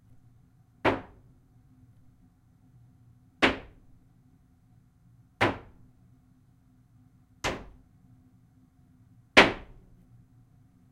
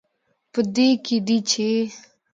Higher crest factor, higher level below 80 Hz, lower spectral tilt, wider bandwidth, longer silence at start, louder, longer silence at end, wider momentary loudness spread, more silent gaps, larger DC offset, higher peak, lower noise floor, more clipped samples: first, 32 dB vs 16 dB; first, -54 dBFS vs -70 dBFS; about the same, -4 dB/octave vs -4 dB/octave; first, 16 kHz vs 9.2 kHz; first, 0.85 s vs 0.55 s; second, -26 LUFS vs -21 LUFS; first, 1.3 s vs 0.35 s; first, 22 LU vs 9 LU; neither; neither; first, -2 dBFS vs -6 dBFS; second, -61 dBFS vs -71 dBFS; neither